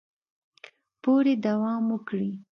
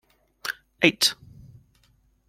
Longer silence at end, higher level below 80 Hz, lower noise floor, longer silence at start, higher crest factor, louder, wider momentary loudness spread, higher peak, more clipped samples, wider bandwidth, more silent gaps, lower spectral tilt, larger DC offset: second, 0.15 s vs 1.15 s; second, -76 dBFS vs -62 dBFS; second, -53 dBFS vs -63 dBFS; first, 1.05 s vs 0.45 s; second, 14 dB vs 26 dB; second, -26 LUFS vs -23 LUFS; second, 9 LU vs 16 LU; second, -12 dBFS vs -2 dBFS; neither; second, 6.2 kHz vs 16.5 kHz; neither; first, -8.5 dB/octave vs -2.5 dB/octave; neither